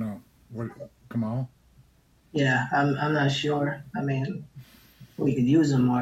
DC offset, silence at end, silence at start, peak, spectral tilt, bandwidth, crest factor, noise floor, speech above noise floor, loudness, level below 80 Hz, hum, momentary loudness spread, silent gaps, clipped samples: under 0.1%; 0 s; 0 s; -10 dBFS; -6.5 dB/octave; 12.5 kHz; 16 dB; -61 dBFS; 36 dB; -26 LUFS; -60 dBFS; none; 18 LU; none; under 0.1%